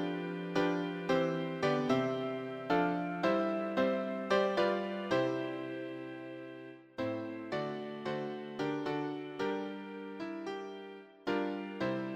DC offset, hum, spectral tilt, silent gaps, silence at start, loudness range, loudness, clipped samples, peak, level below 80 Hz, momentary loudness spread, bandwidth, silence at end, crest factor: under 0.1%; none; -6.5 dB/octave; none; 0 s; 7 LU; -35 LUFS; under 0.1%; -16 dBFS; -72 dBFS; 12 LU; 15 kHz; 0 s; 18 dB